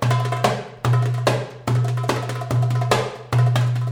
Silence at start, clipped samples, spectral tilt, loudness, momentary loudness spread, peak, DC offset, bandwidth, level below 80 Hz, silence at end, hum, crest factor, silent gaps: 0 s; under 0.1%; -6 dB/octave; -21 LUFS; 5 LU; -4 dBFS; under 0.1%; 14 kHz; -52 dBFS; 0 s; none; 16 dB; none